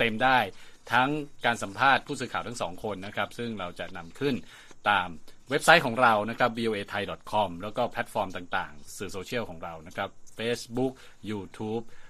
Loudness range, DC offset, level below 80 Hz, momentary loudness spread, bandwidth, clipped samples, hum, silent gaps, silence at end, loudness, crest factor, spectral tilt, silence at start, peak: 8 LU; under 0.1%; -54 dBFS; 14 LU; 15 kHz; under 0.1%; none; none; 0 s; -28 LUFS; 26 dB; -4 dB/octave; 0 s; -2 dBFS